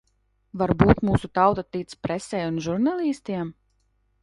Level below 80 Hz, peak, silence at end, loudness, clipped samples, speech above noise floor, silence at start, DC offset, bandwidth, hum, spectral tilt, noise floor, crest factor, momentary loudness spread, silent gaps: -42 dBFS; 0 dBFS; 0.7 s; -24 LUFS; under 0.1%; 45 dB; 0.55 s; under 0.1%; 11.5 kHz; none; -7.5 dB/octave; -68 dBFS; 24 dB; 13 LU; none